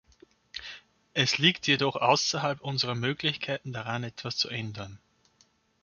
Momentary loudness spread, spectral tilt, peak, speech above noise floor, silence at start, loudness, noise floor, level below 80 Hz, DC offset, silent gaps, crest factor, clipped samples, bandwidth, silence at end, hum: 19 LU; -3.5 dB/octave; -6 dBFS; 38 dB; 0.55 s; -27 LUFS; -67 dBFS; -66 dBFS; under 0.1%; none; 24 dB; under 0.1%; 7.4 kHz; 0.85 s; none